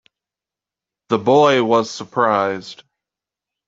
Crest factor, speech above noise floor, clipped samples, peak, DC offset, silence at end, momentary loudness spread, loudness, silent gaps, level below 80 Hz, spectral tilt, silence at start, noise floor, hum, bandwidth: 18 dB; 72 dB; under 0.1%; -2 dBFS; under 0.1%; 0.95 s; 12 LU; -17 LUFS; none; -64 dBFS; -5 dB/octave; 1.1 s; -88 dBFS; none; 7.8 kHz